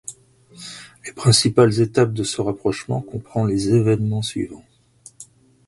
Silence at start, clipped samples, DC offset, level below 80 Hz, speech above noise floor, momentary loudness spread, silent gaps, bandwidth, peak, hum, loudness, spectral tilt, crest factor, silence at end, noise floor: 0.1 s; under 0.1%; under 0.1%; -50 dBFS; 31 dB; 20 LU; none; 11.5 kHz; 0 dBFS; none; -19 LUFS; -5.5 dB/octave; 20 dB; 0.45 s; -50 dBFS